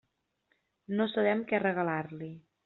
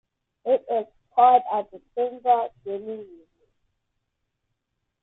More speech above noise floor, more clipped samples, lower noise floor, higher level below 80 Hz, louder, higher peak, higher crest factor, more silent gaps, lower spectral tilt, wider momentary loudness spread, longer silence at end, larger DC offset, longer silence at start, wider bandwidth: second, 46 dB vs 56 dB; neither; about the same, -77 dBFS vs -79 dBFS; about the same, -74 dBFS vs -72 dBFS; second, -31 LUFS vs -23 LUFS; second, -14 dBFS vs -6 dBFS; about the same, 18 dB vs 20 dB; neither; second, -4.5 dB/octave vs -8 dB/octave; second, 14 LU vs 17 LU; second, 0.25 s vs 2 s; neither; first, 0.9 s vs 0.45 s; about the same, 4.2 kHz vs 4 kHz